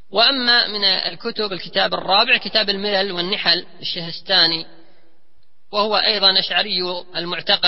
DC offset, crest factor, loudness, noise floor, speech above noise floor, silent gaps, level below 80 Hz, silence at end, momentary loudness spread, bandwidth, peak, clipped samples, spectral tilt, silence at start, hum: 2%; 18 dB; -17 LUFS; -64 dBFS; 45 dB; none; -60 dBFS; 0 s; 11 LU; 6 kHz; -2 dBFS; under 0.1%; -6.5 dB/octave; 0.1 s; none